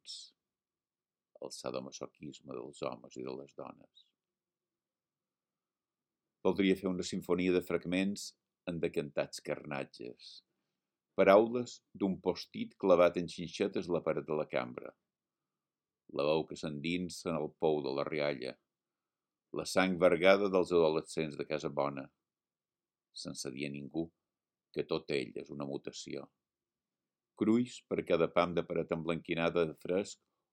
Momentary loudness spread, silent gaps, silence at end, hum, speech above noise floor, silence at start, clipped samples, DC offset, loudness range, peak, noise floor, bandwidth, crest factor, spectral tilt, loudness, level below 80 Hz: 18 LU; none; 0.4 s; none; over 56 dB; 0.05 s; under 0.1%; under 0.1%; 14 LU; -10 dBFS; under -90 dBFS; 16 kHz; 26 dB; -5.5 dB/octave; -34 LUFS; -72 dBFS